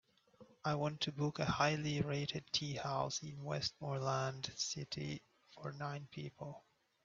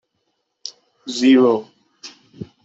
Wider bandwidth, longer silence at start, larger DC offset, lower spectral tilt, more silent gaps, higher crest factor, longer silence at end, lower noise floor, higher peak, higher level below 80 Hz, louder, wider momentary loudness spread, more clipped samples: about the same, 7.6 kHz vs 8 kHz; second, 0.4 s vs 0.65 s; neither; about the same, -4.5 dB/octave vs -4.5 dB/octave; neither; about the same, 22 dB vs 18 dB; first, 0.45 s vs 0.2 s; second, -65 dBFS vs -71 dBFS; second, -18 dBFS vs -4 dBFS; about the same, -68 dBFS vs -66 dBFS; second, -40 LUFS vs -16 LUFS; second, 14 LU vs 26 LU; neither